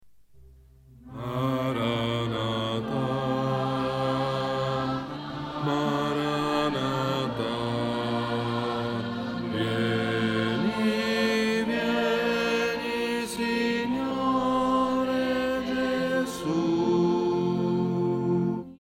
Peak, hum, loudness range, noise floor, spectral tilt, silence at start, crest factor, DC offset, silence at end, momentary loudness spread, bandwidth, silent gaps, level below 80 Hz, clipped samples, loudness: -12 dBFS; none; 3 LU; -53 dBFS; -6 dB/octave; 0.05 s; 14 dB; under 0.1%; 0.05 s; 5 LU; 16 kHz; none; -56 dBFS; under 0.1%; -27 LUFS